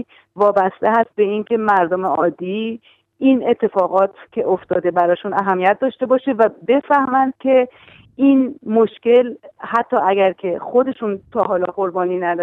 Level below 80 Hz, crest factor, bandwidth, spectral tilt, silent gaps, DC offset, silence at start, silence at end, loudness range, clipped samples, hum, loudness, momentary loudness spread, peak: -64 dBFS; 14 dB; 4.2 kHz; -8 dB/octave; none; under 0.1%; 0.35 s; 0 s; 2 LU; under 0.1%; none; -17 LUFS; 8 LU; -2 dBFS